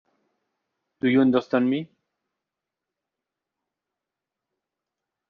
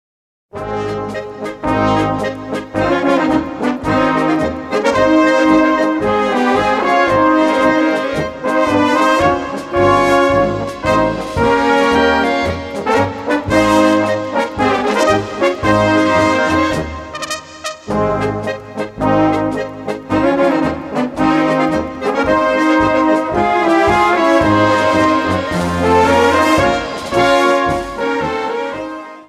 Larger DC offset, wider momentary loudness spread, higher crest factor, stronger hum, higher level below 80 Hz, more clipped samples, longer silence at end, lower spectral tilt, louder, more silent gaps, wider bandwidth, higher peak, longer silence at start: neither; about the same, 8 LU vs 10 LU; first, 20 dB vs 14 dB; neither; second, -70 dBFS vs -38 dBFS; neither; first, 3.45 s vs 0.05 s; about the same, -5.5 dB/octave vs -5.5 dB/octave; second, -22 LUFS vs -14 LUFS; neither; second, 5.4 kHz vs 14 kHz; second, -8 dBFS vs 0 dBFS; first, 1.05 s vs 0.55 s